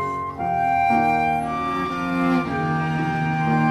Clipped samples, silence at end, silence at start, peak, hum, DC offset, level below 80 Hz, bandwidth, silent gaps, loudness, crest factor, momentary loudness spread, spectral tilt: under 0.1%; 0 s; 0 s; -8 dBFS; none; under 0.1%; -48 dBFS; 13 kHz; none; -22 LUFS; 14 dB; 6 LU; -7.5 dB/octave